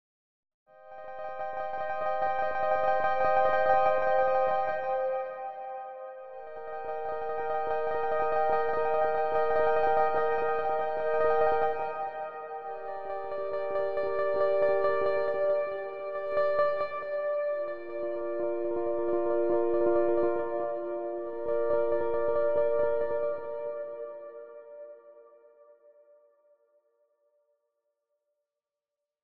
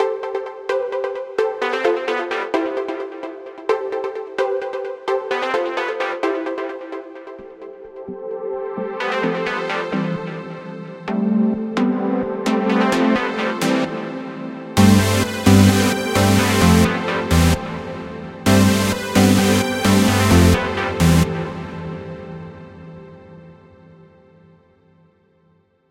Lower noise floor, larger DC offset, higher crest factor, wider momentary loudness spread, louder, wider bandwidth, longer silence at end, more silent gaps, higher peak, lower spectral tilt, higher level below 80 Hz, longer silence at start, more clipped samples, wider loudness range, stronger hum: first, -90 dBFS vs -59 dBFS; first, 0.9% vs under 0.1%; about the same, 18 dB vs 18 dB; second, 14 LU vs 18 LU; second, -29 LUFS vs -19 LUFS; second, 5.8 kHz vs 16 kHz; second, 0 s vs 2.4 s; first, 0.54-0.66 s vs none; second, -12 dBFS vs 0 dBFS; first, -8 dB/octave vs -5.5 dB/octave; second, -62 dBFS vs -38 dBFS; first, 0.5 s vs 0 s; neither; second, 6 LU vs 10 LU; neither